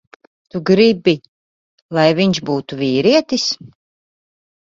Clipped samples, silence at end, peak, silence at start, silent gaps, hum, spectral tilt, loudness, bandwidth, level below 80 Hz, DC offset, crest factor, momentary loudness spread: under 0.1%; 1 s; 0 dBFS; 0.55 s; 1.28-1.89 s; none; -5.5 dB/octave; -16 LUFS; 7.8 kHz; -58 dBFS; under 0.1%; 18 dB; 11 LU